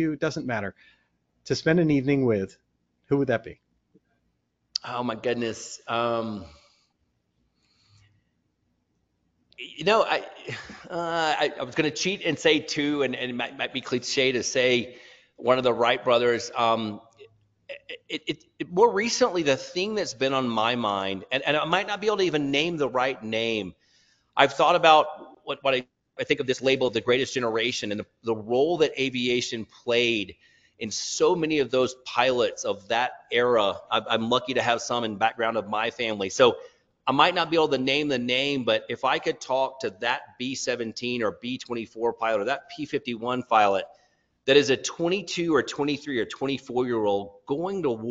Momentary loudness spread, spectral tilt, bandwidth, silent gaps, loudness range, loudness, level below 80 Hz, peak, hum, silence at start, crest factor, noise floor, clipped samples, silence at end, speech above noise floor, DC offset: 11 LU; -4 dB/octave; 8 kHz; none; 7 LU; -25 LUFS; -64 dBFS; -2 dBFS; none; 0 s; 22 dB; -74 dBFS; under 0.1%; 0 s; 49 dB; under 0.1%